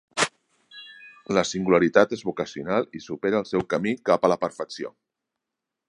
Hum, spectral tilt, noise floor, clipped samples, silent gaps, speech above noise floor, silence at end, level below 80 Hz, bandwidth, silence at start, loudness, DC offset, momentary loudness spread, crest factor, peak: none; -4.5 dB/octave; -85 dBFS; under 0.1%; none; 62 dB; 1 s; -60 dBFS; 11.5 kHz; 0.15 s; -24 LUFS; under 0.1%; 19 LU; 24 dB; -2 dBFS